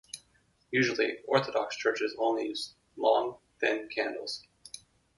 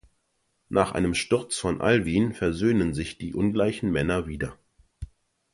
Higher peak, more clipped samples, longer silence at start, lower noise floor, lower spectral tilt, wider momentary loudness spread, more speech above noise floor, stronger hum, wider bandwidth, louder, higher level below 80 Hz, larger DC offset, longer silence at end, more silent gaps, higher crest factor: second, -10 dBFS vs -6 dBFS; neither; second, 0.15 s vs 0.7 s; second, -69 dBFS vs -73 dBFS; second, -4 dB/octave vs -5.5 dB/octave; first, 18 LU vs 12 LU; second, 39 dB vs 48 dB; neither; about the same, 11.5 kHz vs 11.5 kHz; second, -31 LUFS vs -25 LUFS; second, -74 dBFS vs -44 dBFS; neither; about the same, 0.4 s vs 0.5 s; neither; about the same, 22 dB vs 20 dB